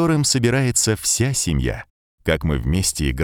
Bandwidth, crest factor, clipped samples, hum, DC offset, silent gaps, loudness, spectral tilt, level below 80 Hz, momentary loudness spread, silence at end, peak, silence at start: 18.5 kHz; 16 dB; under 0.1%; none; under 0.1%; 1.90-2.18 s; -19 LUFS; -4 dB/octave; -30 dBFS; 7 LU; 0 s; -4 dBFS; 0 s